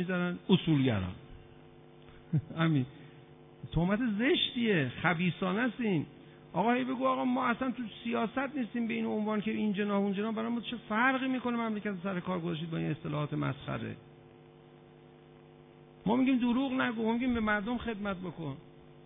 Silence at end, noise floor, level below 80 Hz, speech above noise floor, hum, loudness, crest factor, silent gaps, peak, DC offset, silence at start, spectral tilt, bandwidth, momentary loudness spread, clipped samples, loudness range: 0.05 s; -56 dBFS; -58 dBFS; 24 dB; none; -32 LUFS; 20 dB; none; -12 dBFS; under 0.1%; 0 s; -10 dB/octave; 3.9 kHz; 10 LU; under 0.1%; 6 LU